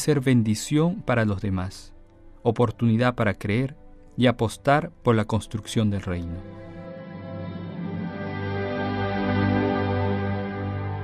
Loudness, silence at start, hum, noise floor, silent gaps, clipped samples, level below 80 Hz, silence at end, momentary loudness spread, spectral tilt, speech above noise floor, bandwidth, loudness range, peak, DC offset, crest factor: -25 LUFS; 0 s; none; -48 dBFS; none; under 0.1%; -48 dBFS; 0 s; 14 LU; -6.5 dB/octave; 24 dB; 14 kHz; 7 LU; -6 dBFS; under 0.1%; 18 dB